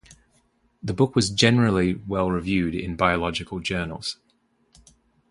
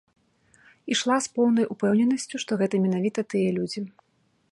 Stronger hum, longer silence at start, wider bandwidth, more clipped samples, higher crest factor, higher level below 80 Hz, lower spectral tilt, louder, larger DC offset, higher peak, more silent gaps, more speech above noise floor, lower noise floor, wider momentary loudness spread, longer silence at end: neither; second, 0.1 s vs 0.85 s; about the same, 11.5 kHz vs 11.5 kHz; neither; first, 22 dB vs 16 dB; first, -44 dBFS vs -72 dBFS; about the same, -5 dB/octave vs -5 dB/octave; about the same, -23 LUFS vs -25 LUFS; neither; first, -2 dBFS vs -10 dBFS; neither; about the same, 44 dB vs 44 dB; about the same, -66 dBFS vs -68 dBFS; first, 13 LU vs 9 LU; first, 1.2 s vs 0.6 s